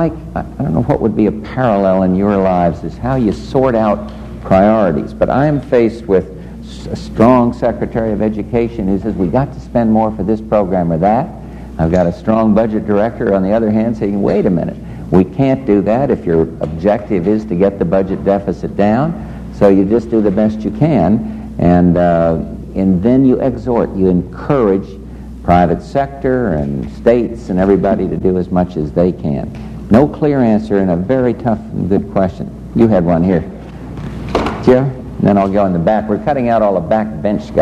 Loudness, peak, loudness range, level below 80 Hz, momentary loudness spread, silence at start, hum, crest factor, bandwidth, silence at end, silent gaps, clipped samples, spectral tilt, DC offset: -14 LUFS; 0 dBFS; 2 LU; -32 dBFS; 9 LU; 0 s; none; 14 dB; 8.6 kHz; 0 s; none; under 0.1%; -9.5 dB/octave; under 0.1%